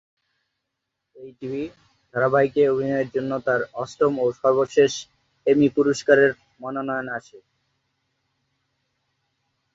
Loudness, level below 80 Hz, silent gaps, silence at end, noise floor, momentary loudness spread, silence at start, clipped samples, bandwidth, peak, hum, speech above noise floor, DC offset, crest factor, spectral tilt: -22 LUFS; -64 dBFS; none; 2.35 s; -81 dBFS; 14 LU; 1.2 s; under 0.1%; 7.8 kHz; -4 dBFS; none; 59 dB; under 0.1%; 18 dB; -5.5 dB/octave